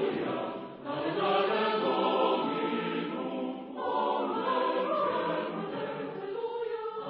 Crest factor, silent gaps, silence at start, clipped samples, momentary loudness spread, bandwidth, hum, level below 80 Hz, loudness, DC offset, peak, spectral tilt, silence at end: 16 dB; none; 0 s; under 0.1%; 9 LU; 5.6 kHz; none; -76 dBFS; -31 LUFS; under 0.1%; -14 dBFS; -3 dB/octave; 0 s